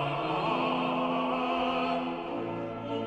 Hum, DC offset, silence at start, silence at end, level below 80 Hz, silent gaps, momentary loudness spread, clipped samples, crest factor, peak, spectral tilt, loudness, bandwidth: none; under 0.1%; 0 s; 0 s; -60 dBFS; none; 6 LU; under 0.1%; 14 dB; -16 dBFS; -7 dB/octave; -30 LUFS; 8.6 kHz